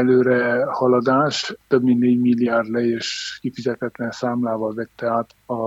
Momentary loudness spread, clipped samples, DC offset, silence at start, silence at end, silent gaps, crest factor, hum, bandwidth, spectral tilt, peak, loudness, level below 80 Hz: 10 LU; under 0.1%; under 0.1%; 0 s; 0 s; none; 16 dB; none; 8 kHz; -5.5 dB/octave; -4 dBFS; -20 LUFS; -64 dBFS